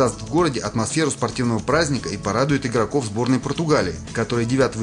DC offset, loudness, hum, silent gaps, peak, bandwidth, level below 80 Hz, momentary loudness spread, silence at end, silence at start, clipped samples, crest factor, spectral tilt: under 0.1%; -21 LUFS; none; none; -4 dBFS; 11 kHz; -44 dBFS; 4 LU; 0 s; 0 s; under 0.1%; 18 dB; -5 dB/octave